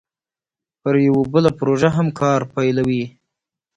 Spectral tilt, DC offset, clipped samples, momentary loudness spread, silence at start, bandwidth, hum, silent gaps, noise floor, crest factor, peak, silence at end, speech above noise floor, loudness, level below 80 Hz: -7.5 dB/octave; under 0.1%; under 0.1%; 7 LU; 0.85 s; 9.4 kHz; none; none; under -90 dBFS; 18 dB; -2 dBFS; 0.7 s; over 73 dB; -18 LUFS; -52 dBFS